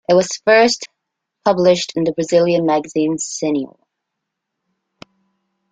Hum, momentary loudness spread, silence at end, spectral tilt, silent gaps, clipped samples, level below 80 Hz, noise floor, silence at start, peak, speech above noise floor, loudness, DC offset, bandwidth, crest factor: none; 10 LU; 2.05 s; -4 dB/octave; none; under 0.1%; -60 dBFS; -78 dBFS; 0.1 s; -2 dBFS; 63 dB; -16 LUFS; under 0.1%; 9.4 kHz; 16 dB